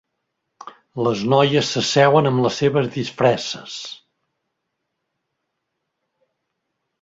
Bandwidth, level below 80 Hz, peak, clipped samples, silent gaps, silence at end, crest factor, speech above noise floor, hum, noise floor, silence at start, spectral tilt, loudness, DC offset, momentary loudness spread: 8 kHz; -62 dBFS; -2 dBFS; under 0.1%; none; 3.05 s; 20 dB; 59 dB; none; -77 dBFS; 0.65 s; -5 dB/octave; -18 LUFS; under 0.1%; 16 LU